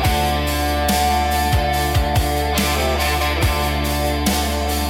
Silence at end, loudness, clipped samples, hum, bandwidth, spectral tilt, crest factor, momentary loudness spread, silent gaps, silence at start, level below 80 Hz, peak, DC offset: 0 s; -18 LUFS; under 0.1%; none; 17 kHz; -4.5 dB/octave; 14 dB; 2 LU; none; 0 s; -24 dBFS; -4 dBFS; under 0.1%